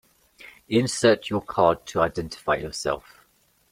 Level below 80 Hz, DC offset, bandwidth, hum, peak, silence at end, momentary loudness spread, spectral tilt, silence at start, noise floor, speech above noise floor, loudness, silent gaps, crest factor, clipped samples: -52 dBFS; under 0.1%; 16 kHz; none; -4 dBFS; 0.75 s; 9 LU; -4.5 dB/octave; 0.4 s; -63 dBFS; 40 dB; -24 LUFS; none; 22 dB; under 0.1%